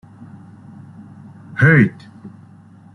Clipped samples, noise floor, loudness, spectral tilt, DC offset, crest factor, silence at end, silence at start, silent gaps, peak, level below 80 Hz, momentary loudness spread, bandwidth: under 0.1%; -44 dBFS; -14 LUFS; -9 dB/octave; under 0.1%; 18 dB; 0.65 s; 1.5 s; none; -2 dBFS; -52 dBFS; 28 LU; 10 kHz